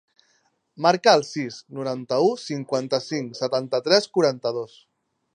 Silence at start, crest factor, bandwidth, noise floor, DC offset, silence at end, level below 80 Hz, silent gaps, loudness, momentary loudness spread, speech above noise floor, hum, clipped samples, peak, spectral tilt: 0.8 s; 22 dB; 10.5 kHz; -67 dBFS; under 0.1%; 0.7 s; -76 dBFS; none; -23 LUFS; 13 LU; 44 dB; none; under 0.1%; -2 dBFS; -4.5 dB/octave